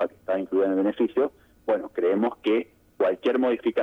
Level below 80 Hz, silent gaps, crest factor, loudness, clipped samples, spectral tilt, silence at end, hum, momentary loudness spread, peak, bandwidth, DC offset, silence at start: -66 dBFS; none; 12 dB; -25 LUFS; under 0.1%; -7.5 dB/octave; 0 s; none; 5 LU; -12 dBFS; 6.2 kHz; under 0.1%; 0 s